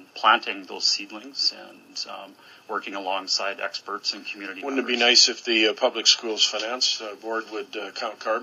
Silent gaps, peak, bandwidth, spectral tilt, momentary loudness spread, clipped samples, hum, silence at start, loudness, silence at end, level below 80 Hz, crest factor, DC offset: none; -2 dBFS; 14.5 kHz; 0.5 dB/octave; 15 LU; under 0.1%; none; 0 s; -22 LUFS; 0 s; under -90 dBFS; 22 dB; under 0.1%